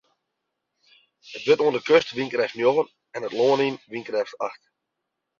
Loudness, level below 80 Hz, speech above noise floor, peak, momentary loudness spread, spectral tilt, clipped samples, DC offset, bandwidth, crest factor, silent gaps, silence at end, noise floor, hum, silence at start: -23 LUFS; -70 dBFS; 59 dB; -2 dBFS; 13 LU; -5 dB/octave; under 0.1%; under 0.1%; 7.4 kHz; 22 dB; none; 0.85 s; -81 dBFS; none; 1.25 s